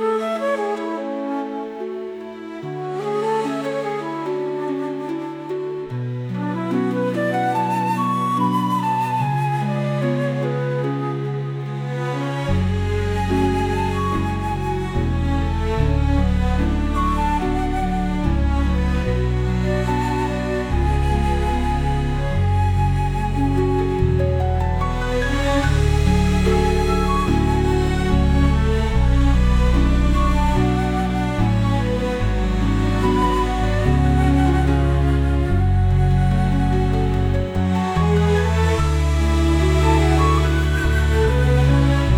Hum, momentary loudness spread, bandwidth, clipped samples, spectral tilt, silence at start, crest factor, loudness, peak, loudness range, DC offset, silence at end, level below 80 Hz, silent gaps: none; 8 LU; 13.5 kHz; under 0.1%; -7 dB/octave; 0 s; 14 dB; -20 LUFS; -4 dBFS; 7 LU; under 0.1%; 0 s; -24 dBFS; none